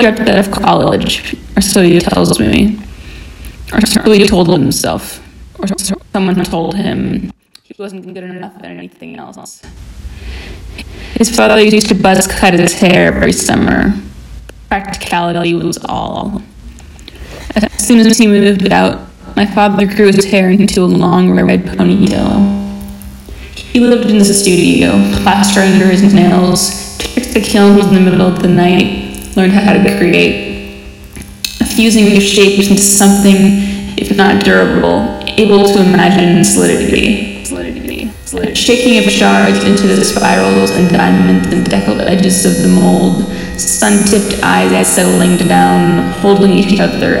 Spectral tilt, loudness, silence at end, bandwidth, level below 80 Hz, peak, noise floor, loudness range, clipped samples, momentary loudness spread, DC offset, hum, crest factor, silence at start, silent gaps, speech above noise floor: -4.5 dB/octave; -9 LUFS; 0 s; 17 kHz; -32 dBFS; 0 dBFS; -32 dBFS; 9 LU; 1%; 18 LU; under 0.1%; none; 10 dB; 0 s; none; 23 dB